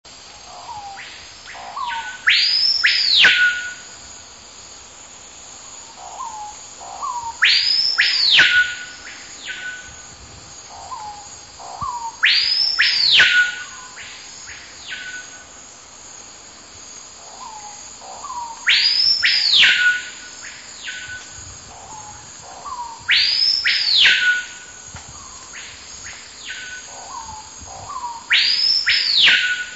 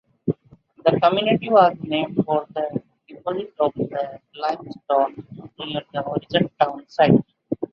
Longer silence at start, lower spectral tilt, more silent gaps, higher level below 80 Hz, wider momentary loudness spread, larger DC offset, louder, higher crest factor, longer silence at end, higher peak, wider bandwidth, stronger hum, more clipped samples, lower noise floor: second, 0.05 s vs 0.25 s; second, 1.5 dB/octave vs -8.5 dB/octave; neither; first, -54 dBFS vs -60 dBFS; first, 25 LU vs 15 LU; first, 0.1% vs under 0.1%; first, -14 LUFS vs -22 LUFS; about the same, 18 dB vs 20 dB; about the same, 0 s vs 0.05 s; about the same, -2 dBFS vs -2 dBFS; first, 8.2 kHz vs 6.6 kHz; neither; neither; second, -41 dBFS vs -52 dBFS